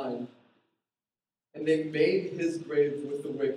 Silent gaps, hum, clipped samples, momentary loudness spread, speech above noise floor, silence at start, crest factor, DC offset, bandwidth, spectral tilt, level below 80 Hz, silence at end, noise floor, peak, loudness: none; none; under 0.1%; 12 LU; over 62 dB; 0 s; 18 dB; under 0.1%; 10.5 kHz; -6.5 dB/octave; -80 dBFS; 0 s; under -90 dBFS; -12 dBFS; -29 LUFS